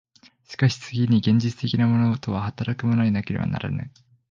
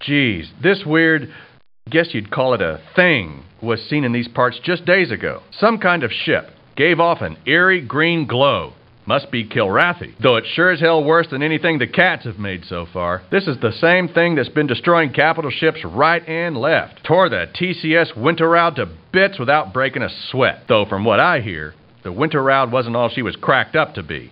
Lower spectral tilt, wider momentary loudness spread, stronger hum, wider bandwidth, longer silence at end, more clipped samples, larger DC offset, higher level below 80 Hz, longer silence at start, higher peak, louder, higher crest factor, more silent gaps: second, -7 dB/octave vs -8.5 dB/octave; about the same, 9 LU vs 9 LU; neither; first, 7.4 kHz vs 5.4 kHz; first, 0.4 s vs 0.05 s; neither; neither; about the same, -50 dBFS vs -52 dBFS; first, 0.5 s vs 0 s; second, -6 dBFS vs 0 dBFS; second, -23 LUFS vs -17 LUFS; about the same, 16 dB vs 18 dB; neither